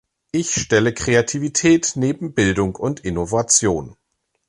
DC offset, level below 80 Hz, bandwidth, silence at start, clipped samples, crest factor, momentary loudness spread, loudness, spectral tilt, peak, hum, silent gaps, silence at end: under 0.1%; -42 dBFS; 11.5 kHz; 0.35 s; under 0.1%; 16 dB; 9 LU; -18 LUFS; -4 dB/octave; -2 dBFS; none; none; 0.55 s